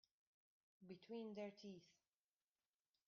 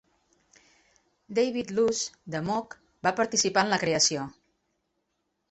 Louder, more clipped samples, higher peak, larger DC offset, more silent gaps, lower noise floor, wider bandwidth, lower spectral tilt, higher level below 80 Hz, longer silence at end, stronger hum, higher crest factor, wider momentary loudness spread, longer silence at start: second, -56 LUFS vs -27 LUFS; neither; second, -42 dBFS vs -8 dBFS; neither; neither; first, under -90 dBFS vs -78 dBFS; second, 7 kHz vs 8.4 kHz; first, -5.5 dB/octave vs -2.5 dB/octave; second, under -90 dBFS vs -66 dBFS; about the same, 1.15 s vs 1.2 s; neither; about the same, 18 dB vs 22 dB; about the same, 11 LU vs 10 LU; second, 0.8 s vs 1.3 s